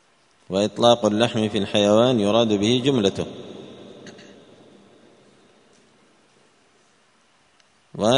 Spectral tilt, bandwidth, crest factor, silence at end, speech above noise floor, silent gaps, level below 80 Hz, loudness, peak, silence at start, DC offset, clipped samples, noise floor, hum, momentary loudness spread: -5 dB/octave; 10.5 kHz; 22 dB; 0 s; 41 dB; none; -60 dBFS; -20 LUFS; -2 dBFS; 0.5 s; under 0.1%; under 0.1%; -60 dBFS; none; 25 LU